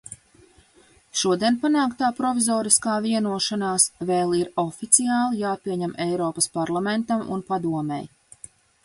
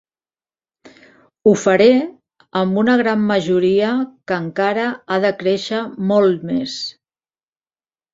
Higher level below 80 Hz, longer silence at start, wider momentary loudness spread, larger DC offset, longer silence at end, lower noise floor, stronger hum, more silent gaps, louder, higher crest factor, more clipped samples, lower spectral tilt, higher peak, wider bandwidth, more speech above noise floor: about the same, -62 dBFS vs -60 dBFS; second, 0.1 s vs 0.85 s; about the same, 10 LU vs 10 LU; neither; second, 0.8 s vs 1.2 s; second, -56 dBFS vs under -90 dBFS; neither; neither; second, -22 LUFS vs -17 LUFS; first, 22 dB vs 16 dB; neither; second, -3.5 dB/octave vs -6 dB/octave; about the same, 0 dBFS vs -2 dBFS; first, 12 kHz vs 7.8 kHz; second, 34 dB vs over 74 dB